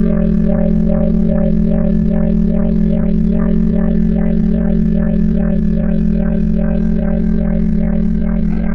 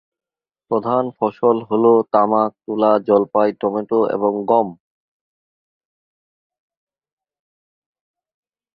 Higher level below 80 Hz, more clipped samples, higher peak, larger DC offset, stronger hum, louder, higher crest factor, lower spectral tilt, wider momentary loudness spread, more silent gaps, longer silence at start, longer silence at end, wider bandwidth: first, -20 dBFS vs -66 dBFS; neither; about the same, -2 dBFS vs -2 dBFS; neither; neither; about the same, -15 LUFS vs -17 LUFS; second, 10 dB vs 18 dB; about the same, -11.5 dB/octave vs -10.5 dB/octave; second, 2 LU vs 8 LU; neither; second, 0 s vs 0.7 s; second, 0 s vs 4 s; second, 3.5 kHz vs 5 kHz